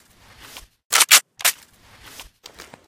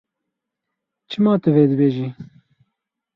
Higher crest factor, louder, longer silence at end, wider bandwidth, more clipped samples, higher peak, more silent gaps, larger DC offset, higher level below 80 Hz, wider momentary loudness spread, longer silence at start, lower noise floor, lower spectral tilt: about the same, 22 dB vs 18 dB; about the same, -15 LUFS vs -17 LUFS; second, 0.65 s vs 0.95 s; first, 17 kHz vs 6 kHz; neither; first, 0 dBFS vs -4 dBFS; first, 0.85-0.90 s vs none; neither; about the same, -58 dBFS vs -62 dBFS; second, 10 LU vs 14 LU; second, 0.55 s vs 1.1 s; second, -49 dBFS vs -81 dBFS; second, 3 dB/octave vs -10 dB/octave